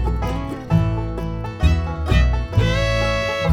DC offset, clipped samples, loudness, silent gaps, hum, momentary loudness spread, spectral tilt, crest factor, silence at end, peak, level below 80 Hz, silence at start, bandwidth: under 0.1%; under 0.1%; -20 LUFS; none; none; 8 LU; -6.5 dB/octave; 14 dB; 0 s; -4 dBFS; -24 dBFS; 0 s; 11 kHz